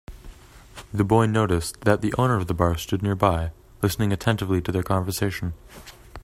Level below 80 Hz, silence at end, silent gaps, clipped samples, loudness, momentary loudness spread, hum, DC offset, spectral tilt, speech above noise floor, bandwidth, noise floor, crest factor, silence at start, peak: -42 dBFS; 0 s; none; under 0.1%; -24 LUFS; 13 LU; none; under 0.1%; -6 dB/octave; 22 dB; 16 kHz; -45 dBFS; 22 dB; 0.1 s; -2 dBFS